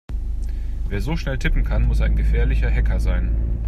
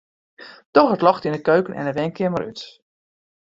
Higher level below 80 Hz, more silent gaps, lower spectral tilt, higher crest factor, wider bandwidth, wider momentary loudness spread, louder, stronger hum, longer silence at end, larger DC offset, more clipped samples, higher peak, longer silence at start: first, -20 dBFS vs -60 dBFS; second, none vs 0.66-0.73 s; about the same, -7 dB/octave vs -7.5 dB/octave; second, 14 dB vs 20 dB; second, 6.8 kHz vs 7.8 kHz; second, 9 LU vs 15 LU; second, -23 LUFS vs -20 LUFS; neither; second, 0 s vs 0.8 s; neither; neither; second, -6 dBFS vs -2 dBFS; second, 0.1 s vs 0.4 s